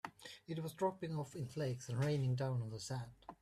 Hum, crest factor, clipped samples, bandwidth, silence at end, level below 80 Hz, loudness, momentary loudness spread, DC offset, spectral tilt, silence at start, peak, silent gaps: none; 16 dB; under 0.1%; 13.5 kHz; 0.05 s; -72 dBFS; -41 LUFS; 10 LU; under 0.1%; -6.5 dB/octave; 0.05 s; -24 dBFS; none